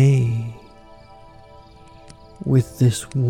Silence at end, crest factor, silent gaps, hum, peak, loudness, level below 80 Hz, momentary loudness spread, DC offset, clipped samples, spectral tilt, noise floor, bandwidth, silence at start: 0 s; 14 dB; none; none; -6 dBFS; -20 LUFS; -50 dBFS; 16 LU; under 0.1%; under 0.1%; -7 dB/octave; -45 dBFS; 13 kHz; 0 s